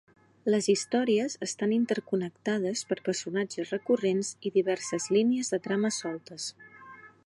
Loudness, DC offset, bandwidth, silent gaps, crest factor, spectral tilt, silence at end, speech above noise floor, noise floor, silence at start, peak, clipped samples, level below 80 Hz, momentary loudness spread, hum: -29 LUFS; under 0.1%; 11.5 kHz; none; 16 dB; -4.5 dB/octave; 0.2 s; 22 dB; -51 dBFS; 0.45 s; -12 dBFS; under 0.1%; -78 dBFS; 11 LU; none